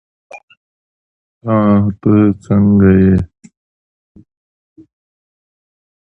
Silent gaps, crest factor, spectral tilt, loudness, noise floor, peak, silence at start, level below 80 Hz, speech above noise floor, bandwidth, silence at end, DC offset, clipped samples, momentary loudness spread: 0.43-0.48 s, 0.57-1.41 s; 14 dB; -11 dB/octave; -12 LUFS; under -90 dBFS; 0 dBFS; 0.35 s; -34 dBFS; over 80 dB; 3.4 kHz; 2.8 s; under 0.1%; under 0.1%; 8 LU